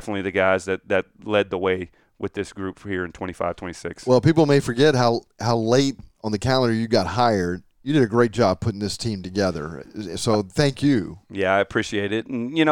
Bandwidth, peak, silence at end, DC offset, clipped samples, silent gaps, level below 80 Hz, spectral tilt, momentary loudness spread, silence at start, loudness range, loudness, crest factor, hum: 16.5 kHz; -4 dBFS; 0 s; under 0.1%; under 0.1%; none; -50 dBFS; -6 dB/octave; 13 LU; 0 s; 4 LU; -22 LUFS; 18 dB; none